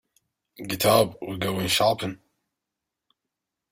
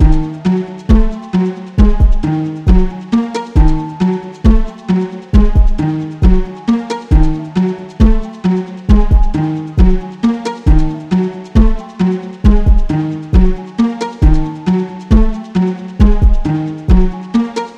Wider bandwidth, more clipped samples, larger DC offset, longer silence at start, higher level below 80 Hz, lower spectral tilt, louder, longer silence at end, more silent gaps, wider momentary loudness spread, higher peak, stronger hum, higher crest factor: first, 16 kHz vs 8 kHz; second, under 0.1% vs 0.8%; neither; first, 0.6 s vs 0 s; second, -58 dBFS vs -12 dBFS; second, -4 dB/octave vs -8.5 dB/octave; second, -24 LUFS vs -14 LUFS; first, 1.55 s vs 0.05 s; neither; first, 14 LU vs 5 LU; second, -6 dBFS vs 0 dBFS; neither; first, 20 dB vs 10 dB